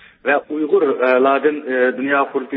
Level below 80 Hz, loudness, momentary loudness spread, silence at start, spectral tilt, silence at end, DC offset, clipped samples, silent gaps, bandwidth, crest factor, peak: -72 dBFS; -17 LUFS; 5 LU; 0.25 s; -9.5 dB/octave; 0 s; under 0.1%; under 0.1%; none; 4.8 kHz; 16 dB; -2 dBFS